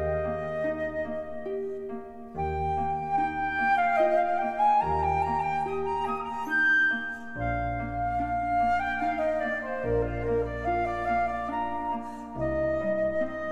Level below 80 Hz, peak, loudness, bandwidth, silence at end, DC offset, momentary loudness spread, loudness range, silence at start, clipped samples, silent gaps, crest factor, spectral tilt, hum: -44 dBFS; -14 dBFS; -28 LUFS; 12.5 kHz; 0 s; under 0.1%; 10 LU; 4 LU; 0 s; under 0.1%; none; 14 dB; -7 dB/octave; none